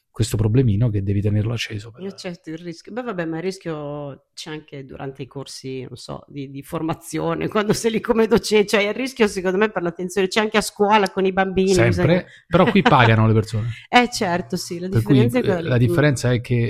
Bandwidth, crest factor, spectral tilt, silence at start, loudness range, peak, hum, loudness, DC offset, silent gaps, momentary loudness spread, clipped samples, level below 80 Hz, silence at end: 15 kHz; 20 dB; -6 dB/octave; 0.15 s; 13 LU; 0 dBFS; none; -19 LUFS; under 0.1%; none; 17 LU; under 0.1%; -44 dBFS; 0 s